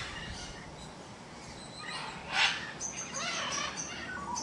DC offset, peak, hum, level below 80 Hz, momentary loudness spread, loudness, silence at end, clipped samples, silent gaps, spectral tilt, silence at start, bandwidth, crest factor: under 0.1%; -16 dBFS; none; -58 dBFS; 18 LU; -34 LUFS; 0 s; under 0.1%; none; -1 dB/octave; 0 s; 11.5 kHz; 22 dB